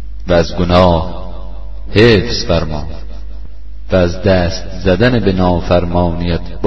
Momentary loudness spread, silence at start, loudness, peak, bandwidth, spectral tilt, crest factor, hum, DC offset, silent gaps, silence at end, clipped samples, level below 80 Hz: 21 LU; 0 s; -13 LUFS; 0 dBFS; 7.8 kHz; -6.5 dB/octave; 14 dB; none; 8%; none; 0 s; under 0.1%; -26 dBFS